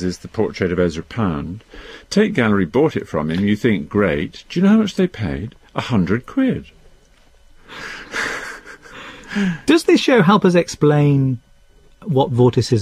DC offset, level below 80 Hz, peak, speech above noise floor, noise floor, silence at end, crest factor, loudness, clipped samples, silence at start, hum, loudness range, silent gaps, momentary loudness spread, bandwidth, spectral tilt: under 0.1%; -44 dBFS; -2 dBFS; 33 dB; -50 dBFS; 0 s; 16 dB; -18 LUFS; under 0.1%; 0 s; none; 8 LU; none; 18 LU; 13.5 kHz; -6.5 dB/octave